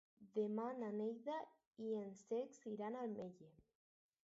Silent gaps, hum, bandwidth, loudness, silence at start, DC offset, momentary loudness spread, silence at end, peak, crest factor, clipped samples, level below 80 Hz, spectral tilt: 1.67-1.71 s; none; 7.6 kHz; -47 LUFS; 0.2 s; under 0.1%; 9 LU; 0.7 s; -32 dBFS; 16 dB; under 0.1%; -90 dBFS; -6.5 dB/octave